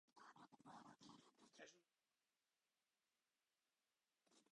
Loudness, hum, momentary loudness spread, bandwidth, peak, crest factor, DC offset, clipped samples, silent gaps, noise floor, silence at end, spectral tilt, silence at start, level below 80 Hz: -67 LUFS; none; 3 LU; 10 kHz; -48 dBFS; 22 dB; under 0.1%; under 0.1%; none; under -90 dBFS; 0 s; -3.5 dB/octave; 0.05 s; under -90 dBFS